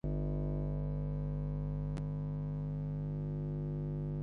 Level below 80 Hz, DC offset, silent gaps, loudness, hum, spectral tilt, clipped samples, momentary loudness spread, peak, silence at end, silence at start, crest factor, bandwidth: -44 dBFS; under 0.1%; none; -38 LUFS; 50 Hz at -40 dBFS; -11.5 dB/octave; under 0.1%; 2 LU; -26 dBFS; 0 s; 0.05 s; 10 dB; 3.2 kHz